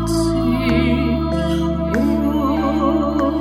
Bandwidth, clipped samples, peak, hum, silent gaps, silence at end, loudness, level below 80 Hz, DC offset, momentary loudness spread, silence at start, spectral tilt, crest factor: 15 kHz; under 0.1%; -4 dBFS; none; none; 0 s; -18 LUFS; -28 dBFS; under 0.1%; 3 LU; 0 s; -7 dB/octave; 14 dB